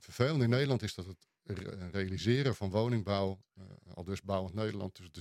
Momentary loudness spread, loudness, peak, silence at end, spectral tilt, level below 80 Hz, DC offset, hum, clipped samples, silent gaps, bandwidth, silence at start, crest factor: 18 LU; -34 LUFS; -12 dBFS; 0 s; -6.5 dB/octave; -66 dBFS; under 0.1%; none; under 0.1%; none; 13.5 kHz; 0.05 s; 22 dB